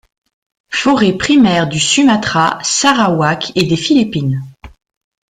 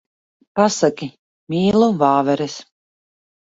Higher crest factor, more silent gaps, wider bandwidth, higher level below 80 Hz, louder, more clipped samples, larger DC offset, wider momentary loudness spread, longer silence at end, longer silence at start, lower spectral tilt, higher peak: about the same, 14 dB vs 18 dB; second, none vs 1.19-1.47 s; first, 10.5 kHz vs 8 kHz; first, -46 dBFS vs -56 dBFS; first, -12 LUFS vs -18 LUFS; neither; neither; second, 7 LU vs 16 LU; second, 0.7 s vs 0.9 s; first, 0.7 s vs 0.55 s; second, -4 dB/octave vs -5.5 dB/octave; about the same, 0 dBFS vs 0 dBFS